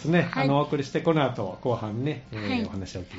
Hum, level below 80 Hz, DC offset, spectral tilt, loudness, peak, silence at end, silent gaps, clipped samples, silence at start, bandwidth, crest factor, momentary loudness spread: none; -56 dBFS; under 0.1%; -5.5 dB/octave; -27 LUFS; -10 dBFS; 0 s; none; under 0.1%; 0 s; 8 kHz; 16 dB; 8 LU